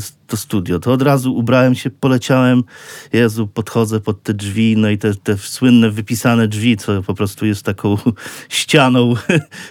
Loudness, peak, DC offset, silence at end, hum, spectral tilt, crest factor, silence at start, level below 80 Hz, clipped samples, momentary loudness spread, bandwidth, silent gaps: -15 LUFS; 0 dBFS; under 0.1%; 0 s; none; -6 dB/octave; 14 dB; 0 s; -52 dBFS; under 0.1%; 8 LU; 17 kHz; none